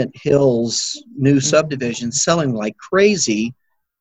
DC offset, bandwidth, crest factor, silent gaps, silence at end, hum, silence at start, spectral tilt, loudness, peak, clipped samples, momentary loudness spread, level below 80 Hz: under 0.1%; 9.4 kHz; 16 dB; none; 0.5 s; none; 0 s; -4.5 dB/octave; -17 LUFS; -2 dBFS; under 0.1%; 8 LU; -54 dBFS